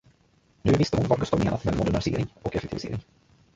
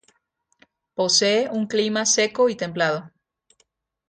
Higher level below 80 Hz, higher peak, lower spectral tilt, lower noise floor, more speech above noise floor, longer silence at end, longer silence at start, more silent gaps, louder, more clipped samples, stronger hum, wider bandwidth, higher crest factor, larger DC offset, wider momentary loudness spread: first, -42 dBFS vs -68 dBFS; about the same, -6 dBFS vs -6 dBFS; first, -7 dB/octave vs -2.5 dB/octave; second, -63 dBFS vs -70 dBFS; second, 38 dB vs 49 dB; second, 0.55 s vs 1 s; second, 0.65 s vs 1 s; neither; second, -26 LUFS vs -21 LUFS; neither; neither; second, 7.8 kHz vs 9.6 kHz; about the same, 20 dB vs 18 dB; neither; first, 10 LU vs 7 LU